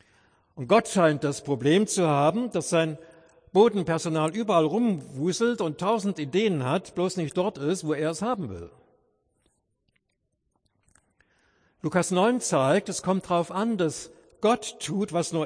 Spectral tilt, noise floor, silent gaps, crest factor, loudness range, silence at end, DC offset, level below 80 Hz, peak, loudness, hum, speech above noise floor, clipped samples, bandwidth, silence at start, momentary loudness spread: -5 dB/octave; -77 dBFS; none; 20 dB; 9 LU; 0 s; under 0.1%; -66 dBFS; -6 dBFS; -25 LUFS; none; 52 dB; under 0.1%; 10.5 kHz; 0.55 s; 7 LU